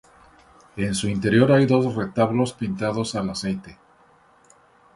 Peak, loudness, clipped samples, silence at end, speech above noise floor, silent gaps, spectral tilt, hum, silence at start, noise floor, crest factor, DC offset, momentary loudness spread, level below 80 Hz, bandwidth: -4 dBFS; -22 LUFS; under 0.1%; 1.2 s; 35 dB; none; -6 dB/octave; none; 0.75 s; -56 dBFS; 20 dB; under 0.1%; 12 LU; -52 dBFS; 11.5 kHz